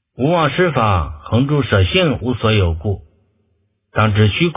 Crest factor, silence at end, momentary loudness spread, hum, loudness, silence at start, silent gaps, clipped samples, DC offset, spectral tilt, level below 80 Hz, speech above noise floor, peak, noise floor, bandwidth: 16 dB; 0.05 s; 8 LU; none; -16 LUFS; 0.2 s; none; under 0.1%; under 0.1%; -10.5 dB/octave; -30 dBFS; 49 dB; 0 dBFS; -64 dBFS; 3.8 kHz